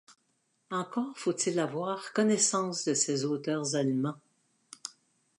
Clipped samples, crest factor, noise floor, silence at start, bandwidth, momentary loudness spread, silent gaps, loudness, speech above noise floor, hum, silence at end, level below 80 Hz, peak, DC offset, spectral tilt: under 0.1%; 20 dB; -75 dBFS; 0.1 s; 11.5 kHz; 17 LU; none; -30 LUFS; 45 dB; none; 0.5 s; -84 dBFS; -12 dBFS; under 0.1%; -3.5 dB/octave